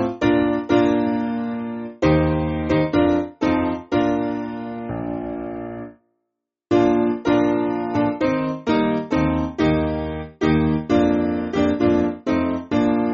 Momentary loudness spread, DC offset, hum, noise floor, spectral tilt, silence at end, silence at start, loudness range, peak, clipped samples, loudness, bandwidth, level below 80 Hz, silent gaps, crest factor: 10 LU; under 0.1%; none; -80 dBFS; -6.5 dB/octave; 0 s; 0 s; 4 LU; -6 dBFS; under 0.1%; -21 LUFS; 7.2 kHz; -40 dBFS; none; 16 dB